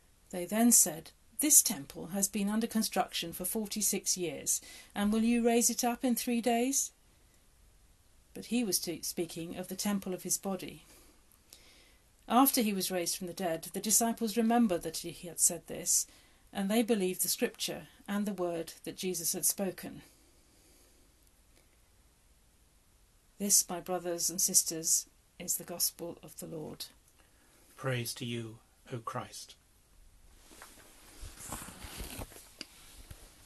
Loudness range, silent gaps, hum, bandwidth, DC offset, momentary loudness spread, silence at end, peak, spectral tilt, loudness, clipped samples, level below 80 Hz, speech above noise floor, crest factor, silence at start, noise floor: 12 LU; none; none; 13 kHz; under 0.1%; 19 LU; 0.2 s; -8 dBFS; -2.5 dB/octave; -31 LUFS; under 0.1%; -62 dBFS; 33 dB; 26 dB; 0.35 s; -65 dBFS